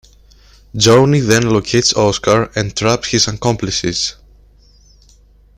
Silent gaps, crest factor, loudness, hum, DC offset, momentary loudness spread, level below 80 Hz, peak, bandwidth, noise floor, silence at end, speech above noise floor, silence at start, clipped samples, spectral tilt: none; 16 dB; -14 LUFS; none; under 0.1%; 8 LU; -40 dBFS; 0 dBFS; 16 kHz; -47 dBFS; 1.45 s; 33 dB; 0.75 s; under 0.1%; -4 dB/octave